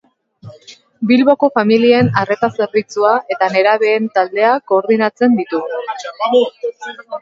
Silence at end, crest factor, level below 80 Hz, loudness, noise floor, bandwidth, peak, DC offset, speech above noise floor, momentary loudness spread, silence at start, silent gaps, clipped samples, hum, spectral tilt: 0 s; 14 dB; -60 dBFS; -14 LUFS; -42 dBFS; 7.6 kHz; 0 dBFS; under 0.1%; 28 dB; 12 LU; 0.45 s; none; under 0.1%; none; -6.5 dB/octave